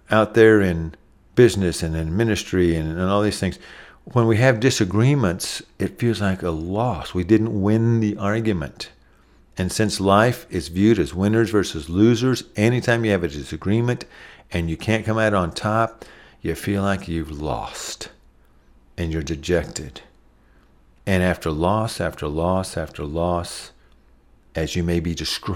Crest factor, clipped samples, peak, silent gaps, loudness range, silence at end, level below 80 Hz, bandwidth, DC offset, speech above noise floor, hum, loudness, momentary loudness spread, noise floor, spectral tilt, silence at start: 20 dB; under 0.1%; -2 dBFS; none; 7 LU; 0 s; -40 dBFS; 16 kHz; under 0.1%; 33 dB; none; -21 LUFS; 13 LU; -54 dBFS; -6 dB/octave; 0.1 s